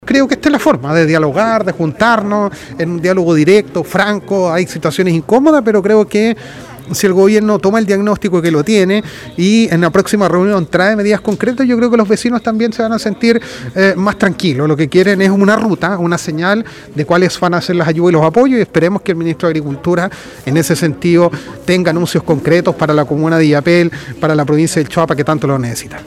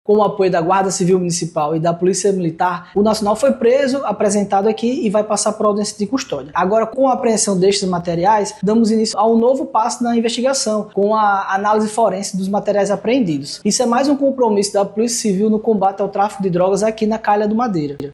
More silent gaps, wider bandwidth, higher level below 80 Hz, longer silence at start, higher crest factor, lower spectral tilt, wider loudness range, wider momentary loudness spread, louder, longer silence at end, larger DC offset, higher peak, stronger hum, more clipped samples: neither; first, 15.5 kHz vs 12.5 kHz; first, -46 dBFS vs -54 dBFS; about the same, 0.05 s vs 0.1 s; about the same, 12 dB vs 12 dB; first, -6 dB/octave vs -4.5 dB/octave; about the same, 2 LU vs 1 LU; about the same, 6 LU vs 5 LU; first, -12 LUFS vs -16 LUFS; about the same, 0 s vs 0 s; neither; first, 0 dBFS vs -4 dBFS; neither; first, 0.4% vs under 0.1%